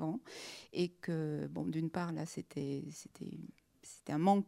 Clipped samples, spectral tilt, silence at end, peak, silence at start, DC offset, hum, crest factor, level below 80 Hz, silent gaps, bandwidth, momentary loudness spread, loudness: under 0.1%; -6.5 dB/octave; 0 s; -18 dBFS; 0 s; under 0.1%; none; 20 dB; -76 dBFS; none; 14.5 kHz; 14 LU; -40 LUFS